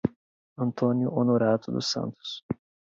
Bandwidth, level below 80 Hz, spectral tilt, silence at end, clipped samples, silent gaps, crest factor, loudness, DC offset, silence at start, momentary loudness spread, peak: 7.6 kHz; -60 dBFS; -6 dB/octave; 0.45 s; under 0.1%; 0.16-0.56 s, 2.43-2.49 s; 18 dB; -27 LUFS; under 0.1%; 0.05 s; 13 LU; -10 dBFS